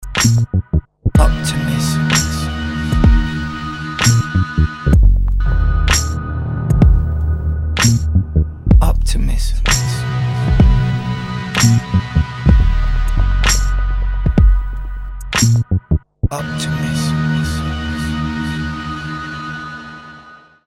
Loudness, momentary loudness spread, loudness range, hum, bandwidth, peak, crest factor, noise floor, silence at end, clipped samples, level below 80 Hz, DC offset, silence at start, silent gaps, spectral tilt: -16 LUFS; 10 LU; 4 LU; none; 13.5 kHz; 0 dBFS; 14 dB; -41 dBFS; 0.3 s; under 0.1%; -18 dBFS; under 0.1%; 0 s; none; -5 dB/octave